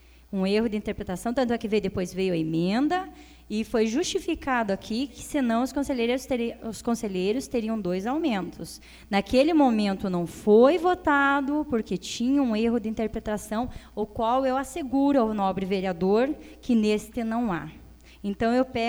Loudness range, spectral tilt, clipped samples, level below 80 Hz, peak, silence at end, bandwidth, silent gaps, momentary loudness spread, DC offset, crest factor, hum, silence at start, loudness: 5 LU; -5.5 dB/octave; under 0.1%; -50 dBFS; -8 dBFS; 0 s; over 20 kHz; none; 10 LU; under 0.1%; 18 dB; none; 0.3 s; -26 LUFS